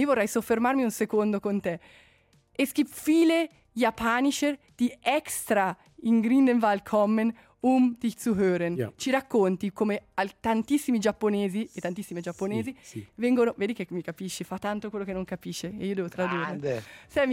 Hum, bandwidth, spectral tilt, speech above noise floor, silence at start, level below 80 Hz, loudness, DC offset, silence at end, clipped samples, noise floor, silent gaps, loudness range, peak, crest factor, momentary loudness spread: none; 16.5 kHz; -5 dB/octave; 36 dB; 0 s; -62 dBFS; -27 LUFS; under 0.1%; 0 s; under 0.1%; -62 dBFS; none; 6 LU; -12 dBFS; 16 dB; 11 LU